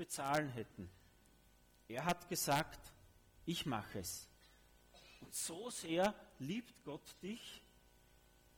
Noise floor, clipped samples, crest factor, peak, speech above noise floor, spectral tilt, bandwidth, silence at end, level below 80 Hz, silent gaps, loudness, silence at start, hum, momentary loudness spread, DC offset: -69 dBFS; under 0.1%; 22 dB; -24 dBFS; 27 dB; -3.5 dB/octave; over 20 kHz; 0.95 s; -68 dBFS; none; -42 LUFS; 0 s; none; 20 LU; under 0.1%